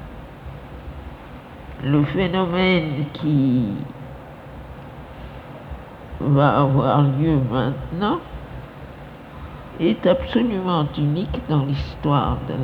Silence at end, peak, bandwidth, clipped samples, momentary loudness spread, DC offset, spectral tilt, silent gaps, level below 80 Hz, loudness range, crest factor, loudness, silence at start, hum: 0 s; -2 dBFS; 5.2 kHz; under 0.1%; 20 LU; under 0.1%; -9.5 dB/octave; none; -38 dBFS; 4 LU; 20 dB; -20 LUFS; 0 s; none